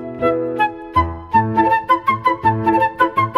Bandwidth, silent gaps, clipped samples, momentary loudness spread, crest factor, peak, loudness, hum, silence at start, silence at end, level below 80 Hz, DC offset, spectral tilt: 13 kHz; none; under 0.1%; 4 LU; 14 dB; -2 dBFS; -17 LUFS; none; 0 s; 0 s; -38 dBFS; under 0.1%; -7.5 dB/octave